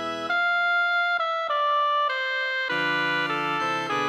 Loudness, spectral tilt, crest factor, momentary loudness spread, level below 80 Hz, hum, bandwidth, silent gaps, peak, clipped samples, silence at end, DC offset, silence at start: -24 LUFS; -3.5 dB/octave; 12 dB; 3 LU; -76 dBFS; none; 16 kHz; none; -12 dBFS; under 0.1%; 0 s; under 0.1%; 0 s